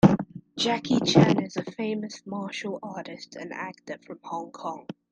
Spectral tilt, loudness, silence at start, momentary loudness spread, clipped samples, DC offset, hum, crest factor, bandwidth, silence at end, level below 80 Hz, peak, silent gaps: -6 dB/octave; -27 LUFS; 0.05 s; 19 LU; under 0.1%; under 0.1%; none; 24 dB; 9 kHz; 0.2 s; -58 dBFS; -2 dBFS; none